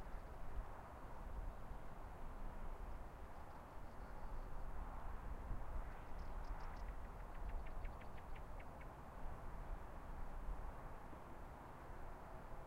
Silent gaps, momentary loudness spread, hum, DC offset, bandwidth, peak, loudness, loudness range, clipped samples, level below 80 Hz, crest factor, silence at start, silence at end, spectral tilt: none; 4 LU; none; under 0.1%; 15.5 kHz; -32 dBFS; -55 LUFS; 2 LU; under 0.1%; -50 dBFS; 16 dB; 0 s; 0 s; -7 dB/octave